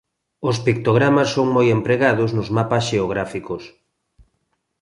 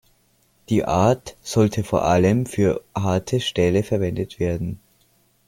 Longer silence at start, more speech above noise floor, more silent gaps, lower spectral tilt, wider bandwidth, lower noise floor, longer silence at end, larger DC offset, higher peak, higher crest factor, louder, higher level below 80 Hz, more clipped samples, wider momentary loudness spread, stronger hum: second, 0.4 s vs 0.7 s; first, 53 dB vs 42 dB; neither; about the same, -6.5 dB/octave vs -6.5 dB/octave; second, 11.5 kHz vs 16.5 kHz; first, -71 dBFS vs -62 dBFS; first, 1.15 s vs 0.7 s; neither; about the same, -4 dBFS vs -4 dBFS; about the same, 16 dB vs 16 dB; about the same, -19 LUFS vs -21 LUFS; about the same, -50 dBFS vs -46 dBFS; neither; first, 11 LU vs 8 LU; neither